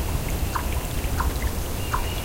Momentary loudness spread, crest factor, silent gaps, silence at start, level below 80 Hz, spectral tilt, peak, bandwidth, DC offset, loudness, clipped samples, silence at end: 2 LU; 14 dB; none; 0 s; -28 dBFS; -4.5 dB/octave; -12 dBFS; 17 kHz; under 0.1%; -27 LUFS; under 0.1%; 0 s